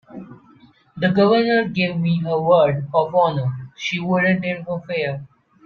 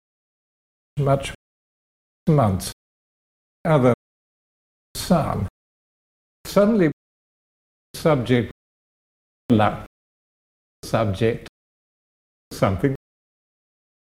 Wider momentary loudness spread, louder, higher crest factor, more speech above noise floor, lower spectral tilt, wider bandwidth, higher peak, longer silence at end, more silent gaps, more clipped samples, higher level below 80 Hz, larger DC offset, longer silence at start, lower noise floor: second, 11 LU vs 16 LU; about the same, -19 LUFS vs -21 LUFS; second, 16 dB vs 22 dB; second, 33 dB vs over 71 dB; about the same, -7 dB/octave vs -7 dB/octave; second, 7 kHz vs 16 kHz; about the same, -4 dBFS vs -4 dBFS; second, 0.4 s vs 1.05 s; second, none vs 1.35-2.27 s, 2.73-3.65 s, 3.94-4.95 s, 5.50-6.44 s, 6.93-7.94 s, 8.51-9.49 s, 9.87-10.82 s, 11.49-12.51 s; neither; second, -58 dBFS vs -46 dBFS; neither; second, 0.1 s vs 0.95 s; second, -51 dBFS vs under -90 dBFS